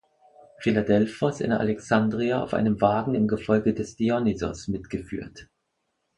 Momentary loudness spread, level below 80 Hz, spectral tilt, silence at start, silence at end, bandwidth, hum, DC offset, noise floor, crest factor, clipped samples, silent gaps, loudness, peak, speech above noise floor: 10 LU; -52 dBFS; -7 dB/octave; 0.6 s; 0.75 s; 9.6 kHz; none; under 0.1%; -77 dBFS; 18 dB; under 0.1%; none; -25 LUFS; -6 dBFS; 52 dB